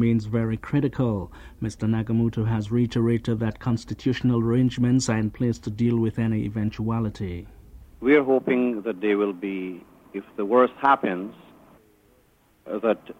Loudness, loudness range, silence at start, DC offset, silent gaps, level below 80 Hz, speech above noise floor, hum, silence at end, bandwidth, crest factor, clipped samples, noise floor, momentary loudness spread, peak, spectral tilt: -24 LUFS; 2 LU; 0 s; under 0.1%; none; -48 dBFS; 37 dB; none; 0.05 s; 10 kHz; 18 dB; under 0.1%; -61 dBFS; 13 LU; -6 dBFS; -7.5 dB/octave